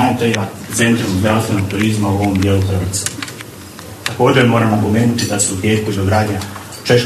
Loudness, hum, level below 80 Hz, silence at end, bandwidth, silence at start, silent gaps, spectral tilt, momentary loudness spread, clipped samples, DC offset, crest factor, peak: -15 LUFS; none; -46 dBFS; 0 s; 13.5 kHz; 0 s; none; -5 dB/octave; 13 LU; under 0.1%; under 0.1%; 14 dB; 0 dBFS